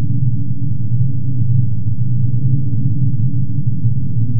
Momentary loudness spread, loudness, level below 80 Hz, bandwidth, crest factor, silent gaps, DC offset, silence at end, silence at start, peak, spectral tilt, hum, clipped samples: 3 LU; -18 LUFS; -40 dBFS; 0.7 kHz; 12 dB; none; 20%; 0 s; 0 s; -2 dBFS; -17 dB/octave; none; under 0.1%